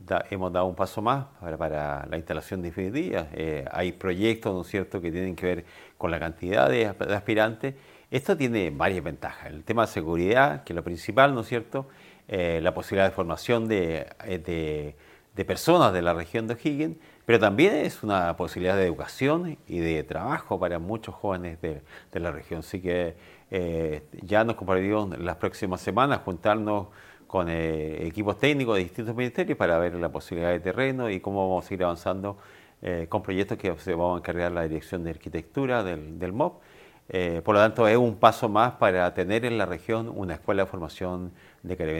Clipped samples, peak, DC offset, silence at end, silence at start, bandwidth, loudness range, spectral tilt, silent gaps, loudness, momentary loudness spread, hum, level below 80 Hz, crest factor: under 0.1%; -2 dBFS; under 0.1%; 0 s; 0 s; 16.5 kHz; 6 LU; -6.5 dB/octave; none; -27 LUFS; 12 LU; none; -50 dBFS; 24 dB